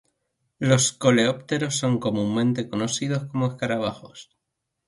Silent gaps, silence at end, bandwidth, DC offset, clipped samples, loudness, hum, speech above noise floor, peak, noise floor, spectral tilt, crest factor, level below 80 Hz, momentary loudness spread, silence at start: none; 0.65 s; 11.5 kHz; under 0.1%; under 0.1%; -23 LUFS; none; 58 dB; -6 dBFS; -81 dBFS; -4.5 dB/octave; 18 dB; -60 dBFS; 8 LU; 0.6 s